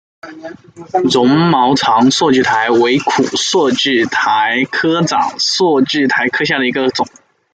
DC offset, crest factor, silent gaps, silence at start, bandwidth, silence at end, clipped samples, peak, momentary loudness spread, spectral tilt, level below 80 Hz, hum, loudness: under 0.1%; 12 dB; none; 0.25 s; 9.2 kHz; 0.45 s; under 0.1%; 0 dBFS; 7 LU; -4 dB/octave; -56 dBFS; none; -12 LUFS